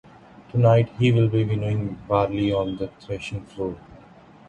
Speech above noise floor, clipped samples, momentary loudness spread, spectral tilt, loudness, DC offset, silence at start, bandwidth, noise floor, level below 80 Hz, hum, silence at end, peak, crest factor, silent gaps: 27 dB; under 0.1%; 14 LU; -8.5 dB/octave; -23 LUFS; under 0.1%; 0.4 s; 8.6 kHz; -48 dBFS; -48 dBFS; none; 0.55 s; -4 dBFS; 18 dB; none